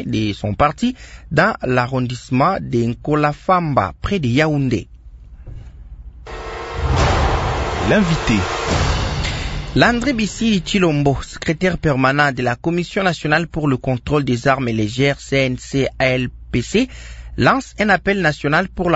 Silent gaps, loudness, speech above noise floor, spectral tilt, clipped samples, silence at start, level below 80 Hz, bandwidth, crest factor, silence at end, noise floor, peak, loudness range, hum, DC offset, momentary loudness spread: none; -18 LUFS; 21 dB; -6 dB/octave; under 0.1%; 0 s; -32 dBFS; 8 kHz; 18 dB; 0 s; -38 dBFS; 0 dBFS; 3 LU; none; under 0.1%; 8 LU